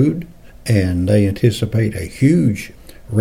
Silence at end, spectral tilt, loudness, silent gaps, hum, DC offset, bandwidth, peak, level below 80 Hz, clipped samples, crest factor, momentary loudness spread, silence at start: 0 s; -7.5 dB/octave; -17 LUFS; none; none; under 0.1%; 16 kHz; -2 dBFS; -40 dBFS; under 0.1%; 14 dB; 14 LU; 0 s